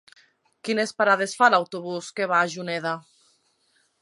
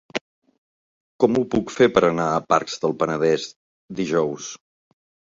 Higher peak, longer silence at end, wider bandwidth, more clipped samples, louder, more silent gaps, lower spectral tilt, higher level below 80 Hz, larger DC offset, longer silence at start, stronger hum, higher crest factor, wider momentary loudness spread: about the same, -4 dBFS vs -2 dBFS; first, 1 s vs 0.75 s; first, 11.5 kHz vs 7.8 kHz; neither; about the same, -23 LUFS vs -21 LUFS; second, none vs 0.21-0.42 s, 0.58-1.19 s, 3.56-3.88 s; second, -3.5 dB/octave vs -5 dB/octave; second, -78 dBFS vs -58 dBFS; neither; first, 0.65 s vs 0.15 s; neither; about the same, 22 dB vs 22 dB; second, 13 LU vs 16 LU